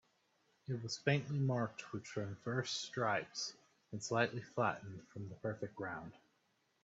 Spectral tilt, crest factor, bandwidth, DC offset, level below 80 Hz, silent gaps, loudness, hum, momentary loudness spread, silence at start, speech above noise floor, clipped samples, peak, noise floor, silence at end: -5 dB/octave; 24 dB; 8 kHz; under 0.1%; -78 dBFS; none; -40 LUFS; none; 13 LU; 0.7 s; 39 dB; under 0.1%; -16 dBFS; -79 dBFS; 0.65 s